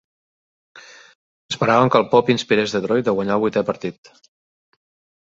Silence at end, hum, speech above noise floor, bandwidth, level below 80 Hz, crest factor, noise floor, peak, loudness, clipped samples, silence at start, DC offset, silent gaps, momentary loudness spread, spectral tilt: 1.3 s; none; over 72 dB; 8 kHz; -60 dBFS; 20 dB; under -90 dBFS; 0 dBFS; -18 LUFS; under 0.1%; 0.75 s; under 0.1%; 1.15-1.49 s; 12 LU; -5.5 dB/octave